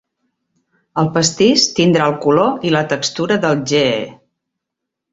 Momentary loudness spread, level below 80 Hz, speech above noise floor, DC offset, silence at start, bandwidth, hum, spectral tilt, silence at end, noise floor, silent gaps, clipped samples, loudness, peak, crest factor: 7 LU; -56 dBFS; 66 dB; under 0.1%; 0.95 s; 8 kHz; none; -4 dB/octave; 1 s; -80 dBFS; none; under 0.1%; -15 LUFS; 0 dBFS; 16 dB